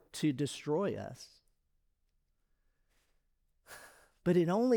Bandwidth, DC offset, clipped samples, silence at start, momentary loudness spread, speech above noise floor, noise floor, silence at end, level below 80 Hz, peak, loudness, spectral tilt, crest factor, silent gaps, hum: over 20 kHz; under 0.1%; under 0.1%; 0.15 s; 23 LU; 46 dB; -77 dBFS; 0 s; -70 dBFS; -18 dBFS; -34 LUFS; -6.5 dB/octave; 18 dB; none; none